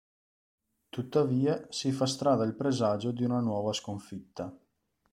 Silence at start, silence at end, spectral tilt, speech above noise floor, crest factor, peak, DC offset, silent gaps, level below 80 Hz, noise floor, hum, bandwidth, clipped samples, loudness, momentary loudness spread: 0.95 s; 0.55 s; -6 dB/octave; 45 dB; 18 dB; -14 dBFS; under 0.1%; none; -70 dBFS; -75 dBFS; none; 12.5 kHz; under 0.1%; -30 LUFS; 14 LU